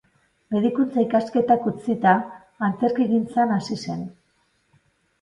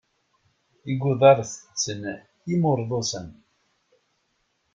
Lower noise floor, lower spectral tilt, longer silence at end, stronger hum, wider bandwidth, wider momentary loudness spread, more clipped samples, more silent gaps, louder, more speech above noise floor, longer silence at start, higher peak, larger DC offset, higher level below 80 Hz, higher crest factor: second, -66 dBFS vs -72 dBFS; first, -7 dB/octave vs -5 dB/octave; second, 1.1 s vs 1.4 s; neither; first, 10.5 kHz vs 7.8 kHz; second, 10 LU vs 19 LU; neither; neither; about the same, -22 LUFS vs -23 LUFS; second, 45 dB vs 49 dB; second, 0.5 s vs 0.85 s; about the same, -2 dBFS vs -4 dBFS; neither; about the same, -64 dBFS vs -62 dBFS; about the same, 20 dB vs 22 dB